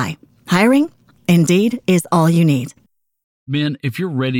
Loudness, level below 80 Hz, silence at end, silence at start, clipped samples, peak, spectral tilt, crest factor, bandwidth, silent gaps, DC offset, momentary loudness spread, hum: -16 LUFS; -58 dBFS; 0 s; 0 s; under 0.1%; -4 dBFS; -6 dB/octave; 14 dB; 16.5 kHz; 3.24-3.46 s; under 0.1%; 11 LU; none